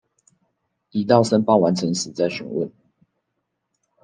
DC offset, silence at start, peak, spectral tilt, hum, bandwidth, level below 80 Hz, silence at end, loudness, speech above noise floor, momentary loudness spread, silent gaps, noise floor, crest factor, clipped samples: under 0.1%; 0.95 s; -2 dBFS; -5.5 dB/octave; none; 9.8 kHz; -66 dBFS; 1.35 s; -20 LUFS; 57 dB; 11 LU; none; -77 dBFS; 20 dB; under 0.1%